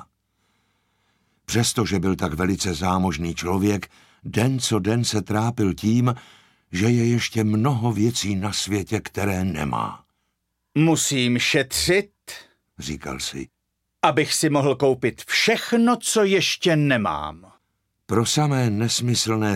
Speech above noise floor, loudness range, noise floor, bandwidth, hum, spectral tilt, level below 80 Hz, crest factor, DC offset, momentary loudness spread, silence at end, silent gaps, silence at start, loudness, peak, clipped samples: 54 dB; 4 LU; -75 dBFS; 16.5 kHz; none; -4.5 dB/octave; -48 dBFS; 20 dB; under 0.1%; 11 LU; 0 s; none; 1.5 s; -21 LUFS; -2 dBFS; under 0.1%